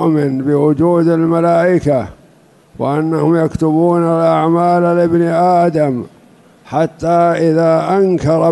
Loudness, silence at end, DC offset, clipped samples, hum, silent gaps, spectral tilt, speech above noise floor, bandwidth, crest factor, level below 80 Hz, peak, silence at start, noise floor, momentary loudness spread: -13 LUFS; 0 s; under 0.1%; under 0.1%; none; none; -8.5 dB/octave; 35 dB; 11.5 kHz; 10 dB; -46 dBFS; -2 dBFS; 0 s; -47 dBFS; 6 LU